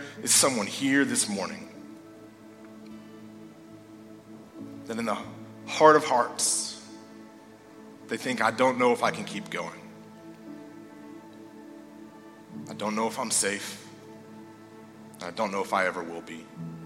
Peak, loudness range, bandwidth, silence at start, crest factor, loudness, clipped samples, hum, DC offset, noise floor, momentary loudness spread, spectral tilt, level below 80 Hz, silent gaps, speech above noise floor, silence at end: -4 dBFS; 15 LU; 16.5 kHz; 0 s; 26 dB; -26 LUFS; under 0.1%; none; under 0.1%; -50 dBFS; 26 LU; -2.5 dB/octave; -74 dBFS; none; 24 dB; 0 s